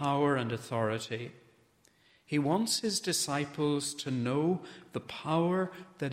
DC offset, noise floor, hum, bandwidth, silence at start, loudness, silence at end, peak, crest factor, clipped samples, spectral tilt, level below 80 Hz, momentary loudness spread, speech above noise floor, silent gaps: under 0.1%; -66 dBFS; none; 16 kHz; 0 s; -32 LUFS; 0 s; -16 dBFS; 16 dB; under 0.1%; -4.5 dB/octave; -72 dBFS; 10 LU; 35 dB; none